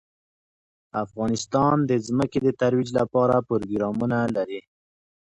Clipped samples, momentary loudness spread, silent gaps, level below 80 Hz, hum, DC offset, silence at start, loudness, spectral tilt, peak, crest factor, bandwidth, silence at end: under 0.1%; 10 LU; none; -56 dBFS; none; under 0.1%; 0.95 s; -24 LUFS; -6.5 dB/octave; -8 dBFS; 16 dB; 11 kHz; 0.8 s